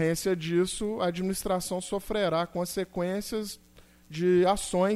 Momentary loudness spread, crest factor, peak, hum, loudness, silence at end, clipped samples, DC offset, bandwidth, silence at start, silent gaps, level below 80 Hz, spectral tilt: 9 LU; 16 dB; -12 dBFS; none; -29 LUFS; 0 s; under 0.1%; under 0.1%; 15.5 kHz; 0 s; none; -52 dBFS; -5 dB/octave